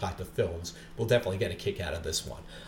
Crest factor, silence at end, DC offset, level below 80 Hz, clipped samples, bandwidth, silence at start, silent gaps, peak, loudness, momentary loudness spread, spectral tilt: 20 dB; 0 s; under 0.1%; -48 dBFS; under 0.1%; 18 kHz; 0 s; none; -12 dBFS; -32 LUFS; 12 LU; -4.5 dB/octave